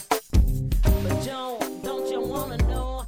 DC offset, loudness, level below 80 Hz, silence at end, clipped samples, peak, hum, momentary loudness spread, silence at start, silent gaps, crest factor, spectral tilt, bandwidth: under 0.1%; -26 LUFS; -26 dBFS; 0 s; under 0.1%; -8 dBFS; none; 7 LU; 0 s; none; 16 dB; -6 dB/octave; over 20 kHz